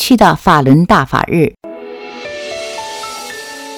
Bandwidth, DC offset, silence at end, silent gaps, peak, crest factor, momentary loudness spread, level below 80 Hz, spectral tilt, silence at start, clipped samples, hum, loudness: 18.5 kHz; under 0.1%; 0 s; none; 0 dBFS; 14 dB; 19 LU; -38 dBFS; -5.5 dB/octave; 0 s; 0.4%; none; -12 LUFS